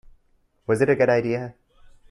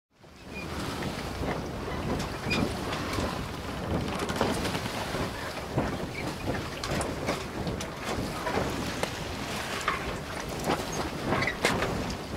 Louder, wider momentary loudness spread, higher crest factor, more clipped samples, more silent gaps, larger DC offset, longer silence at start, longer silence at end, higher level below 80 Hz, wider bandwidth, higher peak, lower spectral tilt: first, -22 LUFS vs -32 LUFS; first, 18 LU vs 6 LU; second, 18 dB vs 26 dB; neither; neither; neither; first, 0.7 s vs 0.2 s; first, 0.6 s vs 0 s; second, -56 dBFS vs -44 dBFS; second, 11.5 kHz vs 16 kHz; about the same, -6 dBFS vs -6 dBFS; first, -7 dB/octave vs -4.5 dB/octave